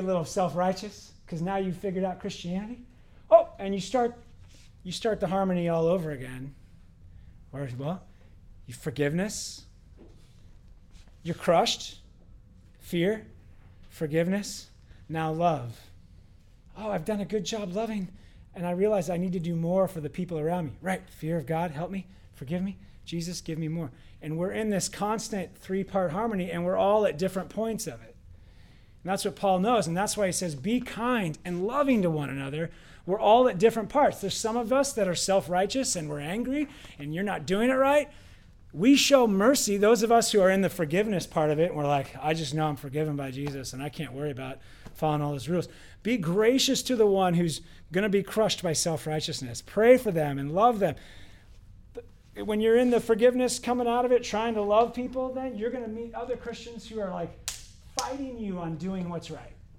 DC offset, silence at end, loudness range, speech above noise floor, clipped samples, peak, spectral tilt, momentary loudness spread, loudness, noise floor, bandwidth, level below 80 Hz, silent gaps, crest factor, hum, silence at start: under 0.1%; 0.1 s; 9 LU; 27 dB; under 0.1%; -6 dBFS; -5 dB/octave; 16 LU; -27 LUFS; -54 dBFS; 16.5 kHz; -54 dBFS; none; 22 dB; none; 0 s